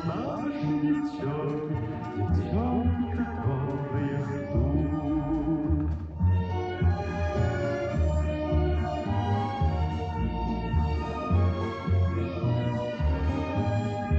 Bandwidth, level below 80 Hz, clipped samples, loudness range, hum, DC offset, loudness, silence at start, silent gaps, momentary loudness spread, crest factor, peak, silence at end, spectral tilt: 7.6 kHz; -38 dBFS; under 0.1%; 1 LU; none; under 0.1%; -28 LUFS; 0 s; none; 4 LU; 14 dB; -14 dBFS; 0 s; -9 dB/octave